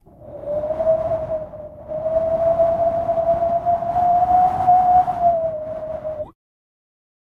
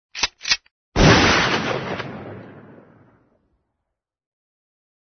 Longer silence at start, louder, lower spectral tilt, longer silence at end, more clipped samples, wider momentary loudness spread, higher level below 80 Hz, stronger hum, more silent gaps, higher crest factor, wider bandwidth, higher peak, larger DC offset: about the same, 0.2 s vs 0.15 s; about the same, -19 LUFS vs -18 LUFS; first, -8.5 dB/octave vs -4 dB/octave; second, 1.05 s vs 2.5 s; neither; second, 15 LU vs 22 LU; second, -44 dBFS vs -36 dBFS; neither; second, none vs 0.71-0.92 s; second, 16 dB vs 22 dB; second, 4.2 kHz vs 6.6 kHz; about the same, -4 dBFS vs -2 dBFS; neither